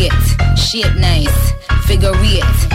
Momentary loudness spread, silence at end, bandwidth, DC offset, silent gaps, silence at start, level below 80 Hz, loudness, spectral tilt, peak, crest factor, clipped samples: 3 LU; 0 s; 16.5 kHz; under 0.1%; none; 0 s; -14 dBFS; -13 LUFS; -5 dB/octave; -2 dBFS; 8 dB; under 0.1%